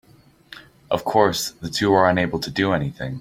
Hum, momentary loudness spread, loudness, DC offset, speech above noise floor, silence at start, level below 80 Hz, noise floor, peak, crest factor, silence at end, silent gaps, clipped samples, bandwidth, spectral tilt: none; 9 LU; -21 LUFS; under 0.1%; 27 dB; 0.5 s; -50 dBFS; -47 dBFS; -2 dBFS; 20 dB; 0 s; none; under 0.1%; 16.5 kHz; -5 dB/octave